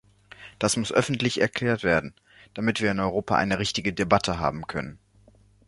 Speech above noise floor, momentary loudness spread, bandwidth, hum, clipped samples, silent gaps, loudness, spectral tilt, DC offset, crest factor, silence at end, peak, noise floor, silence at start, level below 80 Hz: 32 dB; 14 LU; 11.5 kHz; none; under 0.1%; none; -25 LUFS; -4.5 dB/octave; under 0.1%; 24 dB; 0.7 s; -2 dBFS; -57 dBFS; 0.4 s; -50 dBFS